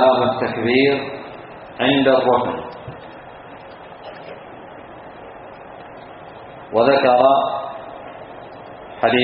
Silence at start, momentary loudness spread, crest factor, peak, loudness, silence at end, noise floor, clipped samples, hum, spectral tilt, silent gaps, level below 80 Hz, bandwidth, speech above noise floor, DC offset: 0 s; 23 LU; 20 dB; 0 dBFS; -17 LUFS; 0 s; -38 dBFS; under 0.1%; none; -3 dB/octave; none; -56 dBFS; 5.2 kHz; 22 dB; under 0.1%